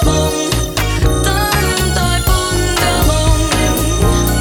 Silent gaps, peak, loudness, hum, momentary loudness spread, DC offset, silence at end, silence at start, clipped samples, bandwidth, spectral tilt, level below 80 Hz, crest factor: none; 0 dBFS; -14 LUFS; none; 2 LU; under 0.1%; 0 s; 0 s; under 0.1%; 19.5 kHz; -4 dB/octave; -18 dBFS; 12 dB